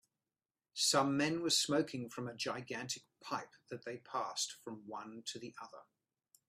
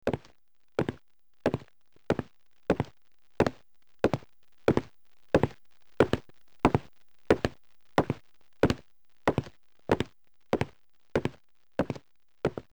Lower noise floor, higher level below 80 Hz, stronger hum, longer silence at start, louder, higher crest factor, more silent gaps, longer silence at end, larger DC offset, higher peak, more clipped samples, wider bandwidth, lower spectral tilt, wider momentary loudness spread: first, under -90 dBFS vs -69 dBFS; second, -80 dBFS vs -50 dBFS; neither; first, 0.75 s vs 0.05 s; second, -37 LUFS vs -31 LUFS; about the same, 22 dB vs 20 dB; neither; first, 0.65 s vs 0.15 s; second, under 0.1% vs 0.3%; second, -18 dBFS vs -10 dBFS; neither; second, 15.5 kHz vs over 20 kHz; second, -2.5 dB/octave vs -7 dB/octave; first, 17 LU vs 10 LU